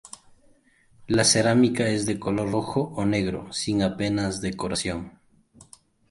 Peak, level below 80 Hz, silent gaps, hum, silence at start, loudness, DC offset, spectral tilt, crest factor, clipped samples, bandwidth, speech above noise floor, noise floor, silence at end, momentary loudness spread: -6 dBFS; -50 dBFS; none; none; 0.05 s; -24 LUFS; under 0.1%; -4.5 dB/octave; 20 dB; under 0.1%; 11.5 kHz; 35 dB; -59 dBFS; 0.45 s; 11 LU